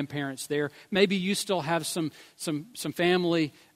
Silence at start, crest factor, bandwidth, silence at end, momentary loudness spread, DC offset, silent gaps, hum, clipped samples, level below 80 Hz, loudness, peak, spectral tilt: 0 s; 20 dB; 16 kHz; 0.25 s; 9 LU; under 0.1%; none; none; under 0.1%; -70 dBFS; -28 LUFS; -8 dBFS; -4.5 dB/octave